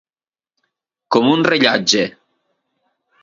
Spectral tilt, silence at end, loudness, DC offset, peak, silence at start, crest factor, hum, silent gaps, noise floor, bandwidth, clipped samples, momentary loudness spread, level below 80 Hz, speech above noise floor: -3.5 dB/octave; 1.1 s; -15 LUFS; under 0.1%; 0 dBFS; 1.1 s; 20 dB; none; none; under -90 dBFS; 7.6 kHz; under 0.1%; 5 LU; -62 dBFS; over 76 dB